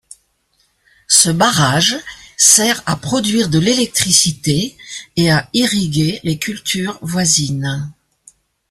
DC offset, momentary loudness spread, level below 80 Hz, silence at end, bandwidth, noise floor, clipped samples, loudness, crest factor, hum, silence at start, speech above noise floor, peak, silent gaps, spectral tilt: under 0.1%; 13 LU; -48 dBFS; 0.8 s; 16 kHz; -61 dBFS; under 0.1%; -14 LUFS; 16 dB; none; 1.1 s; 46 dB; 0 dBFS; none; -3 dB/octave